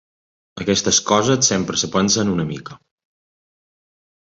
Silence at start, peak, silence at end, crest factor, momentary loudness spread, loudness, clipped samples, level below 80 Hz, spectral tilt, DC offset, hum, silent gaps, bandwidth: 0.55 s; -2 dBFS; 1.55 s; 20 dB; 11 LU; -17 LUFS; under 0.1%; -50 dBFS; -3 dB/octave; under 0.1%; none; none; 8 kHz